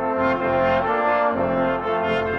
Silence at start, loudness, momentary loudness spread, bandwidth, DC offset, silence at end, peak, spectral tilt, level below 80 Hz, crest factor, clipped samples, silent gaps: 0 s; -21 LUFS; 2 LU; 6.8 kHz; under 0.1%; 0 s; -8 dBFS; -7.5 dB/octave; -48 dBFS; 12 dB; under 0.1%; none